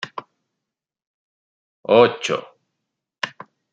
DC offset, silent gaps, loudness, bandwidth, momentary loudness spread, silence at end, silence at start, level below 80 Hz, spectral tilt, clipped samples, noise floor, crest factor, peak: under 0.1%; 1.07-1.83 s; -19 LUFS; 9 kHz; 20 LU; 0.45 s; 0 s; -68 dBFS; -4.5 dB/octave; under 0.1%; -83 dBFS; 22 dB; -2 dBFS